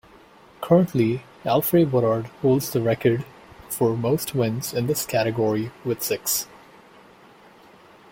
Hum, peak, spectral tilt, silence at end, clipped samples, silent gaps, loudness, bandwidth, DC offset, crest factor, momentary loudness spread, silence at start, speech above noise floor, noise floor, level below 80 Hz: none; -4 dBFS; -5.5 dB/octave; 1.65 s; under 0.1%; none; -23 LUFS; 17 kHz; under 0.1%; 20 dB; 9 LU; 0.6 s; 29 dB; -50 dBFS; -58 dBFS